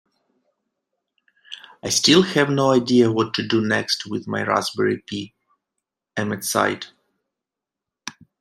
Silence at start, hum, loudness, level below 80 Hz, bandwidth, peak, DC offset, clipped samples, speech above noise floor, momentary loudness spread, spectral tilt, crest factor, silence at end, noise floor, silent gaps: 1.5 s; none; -20 LUFS; -64 dBFS; 15.5 kHz; -2 dBFS; under 0.1%; under 0.1%; 66 dB; 22 LU; -4 dB/octave; 20 dB; 0.3 s; -86 dBFS; none